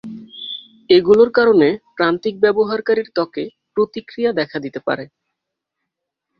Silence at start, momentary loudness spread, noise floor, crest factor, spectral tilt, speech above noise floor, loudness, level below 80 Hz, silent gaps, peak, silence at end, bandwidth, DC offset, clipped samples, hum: 0.05 s; 17 LU; -80 dBFS; 18 dB; -7 dB/octave; 64 dB; -17 LUFS; -58 dBFS; none; 0 dBFS; 1.35 s; 6 kHz; under 0.1%; under 0.1%; none